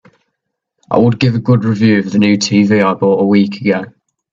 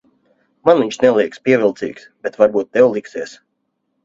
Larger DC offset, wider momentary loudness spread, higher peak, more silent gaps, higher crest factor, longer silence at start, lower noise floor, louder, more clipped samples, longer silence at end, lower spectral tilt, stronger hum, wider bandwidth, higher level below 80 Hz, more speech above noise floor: neither; second, 6 LU vs 14 LU; about the same, 0 dBFS vs 0 dBFS; neither; second, 12 dB vs 18 dB; first, 0.9 s vs 0.65 s; about the same, -73 dBFS vs -71 dBFS; first, -12 LUFS vs -15 LUFS; neither; second, 0.45 s vs 0.7 s; about the same, -6.5 dB/octave vs -5.5 dB/octave; neither; about the same, 7.4 kHz vs 7.6 kHz; first, -52 dBFS vs -60 dBFS; first, 62 dB vs 55 dB